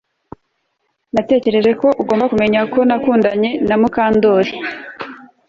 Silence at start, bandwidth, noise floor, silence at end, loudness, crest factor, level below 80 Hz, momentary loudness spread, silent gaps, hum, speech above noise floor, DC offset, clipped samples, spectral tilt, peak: 1.15 s; 7.2 kHz; -68 dBFS; 0.3 s; -15 LUFS; 14 dB; -50 dBFS; 12 LU; none; none; 55 dB; under 0.1%; under 0.1%; -7 dB/octave; -2 dBFS